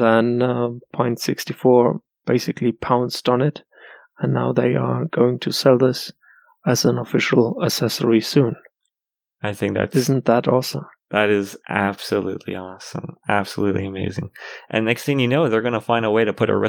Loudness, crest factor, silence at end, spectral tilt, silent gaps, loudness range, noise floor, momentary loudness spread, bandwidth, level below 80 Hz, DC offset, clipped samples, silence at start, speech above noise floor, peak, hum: -20 LUFS; 18 dB; 0 s; -5.5 dB/octave; none; 4 LU; -88 dBFS; 12 LU; over 20 kHz; -62 dBFS; under 0.1%; under 0.1%; 0 s; 69 dB; -2 dBFS; none